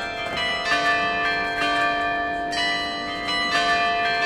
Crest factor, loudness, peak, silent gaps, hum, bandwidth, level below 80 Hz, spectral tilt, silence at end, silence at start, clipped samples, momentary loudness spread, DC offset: 14 dB; -22 LUFS; -8 dBFS; none; none; 14 kHz; -48 dBFS; -2.5 dB/octave; 0 s; 0 s; under 0.1%; 5 LU; under 0.1%